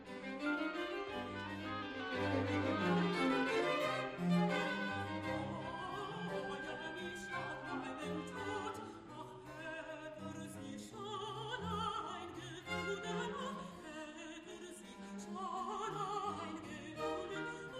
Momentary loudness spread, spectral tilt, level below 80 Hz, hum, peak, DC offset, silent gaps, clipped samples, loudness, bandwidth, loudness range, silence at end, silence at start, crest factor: 14 LU; -5.5 dB/octave; -70 dBFS; none; -24 dBFS; under 0.1%; none; under 0.1%; -41 LUFS; 13 kHz; 9 LU; 0 s; 0 s; 18 dB